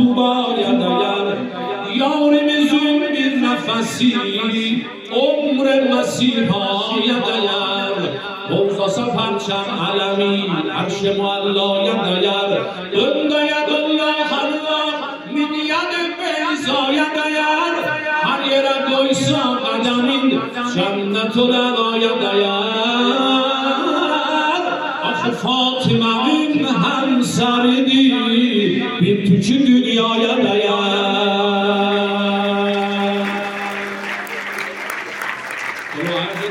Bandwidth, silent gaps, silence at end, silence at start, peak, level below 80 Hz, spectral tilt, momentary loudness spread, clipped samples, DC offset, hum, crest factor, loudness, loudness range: 16 kHz; none; 0 s; 0 s; -2 dBFS; -62 dBFS; -5 dB/octave; 7 LU; under 0.1%; under 0.1%; none; 14 dB; -17 LUFS; 3 LU